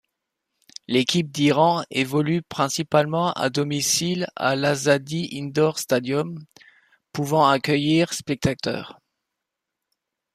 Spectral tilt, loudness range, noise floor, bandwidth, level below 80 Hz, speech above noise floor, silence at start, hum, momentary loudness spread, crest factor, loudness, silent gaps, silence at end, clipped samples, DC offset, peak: -4.5 dB/octave; 2 LU; -83 dBFS; 15 kHz; -58 dBFS; 62 dB; 0.9 s; none; 10 LU; 18 dB; -22 LUFS; none; 1.4 s; under 0.1%; under 0.1%; -4 dBFS